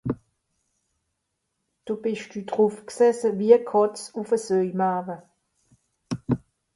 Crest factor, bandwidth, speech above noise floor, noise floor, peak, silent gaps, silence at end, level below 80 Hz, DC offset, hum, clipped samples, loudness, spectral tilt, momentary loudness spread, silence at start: 22 dB; 11.5 kHz; 56 dB; -78 dBFS; -4 dBFS; none; 0.4 s; -60 dBFS; under 0.1%; none; under 0.1%; -24 LUFS; -6.5 dB/octave; 16 LU; 0.05 s